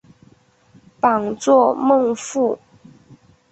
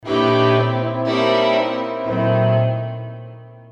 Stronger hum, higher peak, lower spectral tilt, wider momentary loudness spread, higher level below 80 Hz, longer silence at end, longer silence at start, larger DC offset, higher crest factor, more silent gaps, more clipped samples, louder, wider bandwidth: neither; about the same, -2 dBFS vs -4 dBFS; second, -5 dB/octave vs -7.5 dB/octave; second, 7 LU vs 15 LU; about the same, -62 dBFS vs -58 dBFS; first, 0.95 s vs 0.05 s; first, 1.05 s vs 0.05 s; neither; about the same, 18 dB vs 16 dB; neither; neither; about the same, -17 LUFS vs -18 LUFS; first, 8.4 kHz vs 7.4 kHz